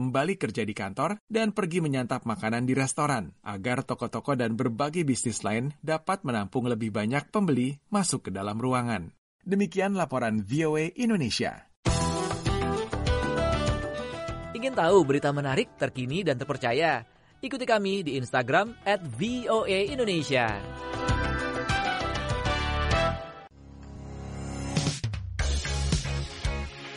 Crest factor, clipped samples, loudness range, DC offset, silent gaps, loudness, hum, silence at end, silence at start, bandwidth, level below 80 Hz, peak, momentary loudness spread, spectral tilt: 20 dB; under 0.1%; 3 LU; under 0.1%; 1.20-1.28 s, 9.18-9.39 s, 11.76-11.83 s; -28 LUFS; none; 0 s; 0 s; 11.5 kHz; -40 dBFS; -8 dBFS; 8 LU; -5 dB/octave